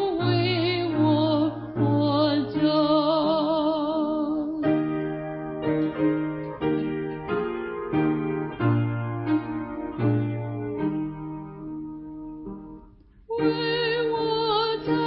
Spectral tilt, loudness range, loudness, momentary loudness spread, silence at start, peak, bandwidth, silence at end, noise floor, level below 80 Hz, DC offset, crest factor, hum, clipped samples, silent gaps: -11.5 dB/octave; 8 LU; -25 LUFS; 14 LU; 0 s; -10 dBFS; 5.4 kHz; 0 s; -51 dBFS; -54 dBFS; under 0.1%; 16 dB; none; under 0.1%; none